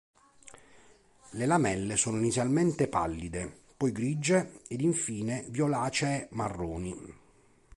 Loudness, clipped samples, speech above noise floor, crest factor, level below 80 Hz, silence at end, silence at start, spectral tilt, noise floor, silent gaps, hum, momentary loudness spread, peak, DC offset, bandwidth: -30 LUFS; under 0.1%; 33 dB; 18 dB; -54 dBFS; 0.65 s; 0.45 s; -5 dB/octave; -62 dBFS; none; none; 12 LU; -12 dBFS; under 0.1%; 11.5 kHz